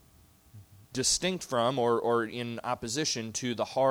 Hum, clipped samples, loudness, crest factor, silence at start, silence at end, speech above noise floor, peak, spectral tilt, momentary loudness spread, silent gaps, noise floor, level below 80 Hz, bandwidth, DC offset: none; under 0.1%; -30 LUFS; 18 dB; 0.55 s; 0 s; 30 dB; -14 dBFS; -3 dB/octave; 8 LU; none; -60 dBFS; -60 dBFS; over 20 kHz; under 0.1%